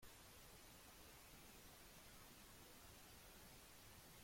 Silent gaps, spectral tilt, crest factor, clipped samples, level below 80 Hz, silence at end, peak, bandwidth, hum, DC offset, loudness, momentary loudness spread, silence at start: none; -2.5 dB/octave; 14 dB; under 0.1%; -72 dBFS; 0 s; -50 dBFS; 16.5 kHz; none; under 0.1%; -62 LUFS; 0 LU; 0 s